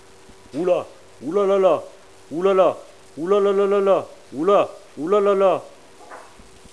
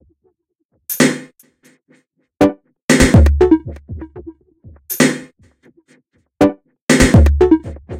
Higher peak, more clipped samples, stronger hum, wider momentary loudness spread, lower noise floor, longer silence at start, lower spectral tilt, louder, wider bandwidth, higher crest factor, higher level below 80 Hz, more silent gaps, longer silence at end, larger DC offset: second, -4 dBFS vs 0 dBFS; neither; neither; second, 16 LU vs 21 LU; second, -47 dBFS vs -66 dBFS; second, 0.55 s vs 0.9 s; about the same, -6.5 dB/octave vs -5.5 dB/octave; second, -20 LUFS vs -14 LUFS; second, 11 kHz vs 16 kHz; about the same, 16 dB vs 16 dB; second, -64 dBFS vs -22 dBFS; second, none vs 2.82-2.88 s, 6.82-6.87 s; first, 0.5 s vs 0 s; first, 0.3% vs under 0.1%